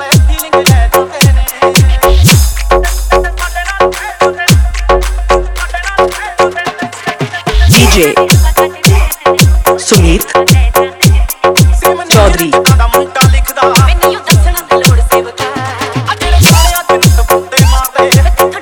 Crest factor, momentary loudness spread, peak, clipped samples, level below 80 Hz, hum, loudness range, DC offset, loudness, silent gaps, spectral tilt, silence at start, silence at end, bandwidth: 8 dB; 8 LU; 0 dBFS; 2%; -12 dBFS; none; 4 LU; under 0.1%; -8 LUFS; none; -4.5 dB/octave; 0 s; 0 s; over 20 kHz